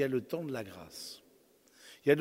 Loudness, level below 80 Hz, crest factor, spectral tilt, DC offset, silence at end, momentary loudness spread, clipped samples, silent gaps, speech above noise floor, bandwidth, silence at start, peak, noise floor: -37 LUFS; -74 dBFS; 22 dB; -5.5 dB/octave; under 0.1%; 0 s; 21 LU; under 0.1%; none; 29 dB; 16 kHz; 0 s; -12 dBFS; -65 dBFS